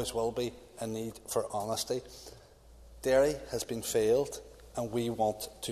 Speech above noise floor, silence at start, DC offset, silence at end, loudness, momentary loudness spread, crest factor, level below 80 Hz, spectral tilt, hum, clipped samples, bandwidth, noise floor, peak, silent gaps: 23 dB; 0 s; under 0.1%; 0 s; -33 LUFS; 14 LU; 18 dB; -56 dBFS; -4 dB/octave; none; under 0.1%; 14 kHz; -55 dBFS; -16 dBFS; none